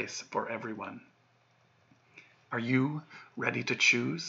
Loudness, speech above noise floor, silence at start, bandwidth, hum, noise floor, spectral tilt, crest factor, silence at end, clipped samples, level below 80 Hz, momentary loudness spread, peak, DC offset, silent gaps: -31 LUFS; 35 dB; 0 s; 7.8 kHz; none; -68 dBFS; -4 dB/octave; 22 dB; 0 s; under 0.1%; -86 dBFS; 18 LU; -12 dBFS; under 0.1%; none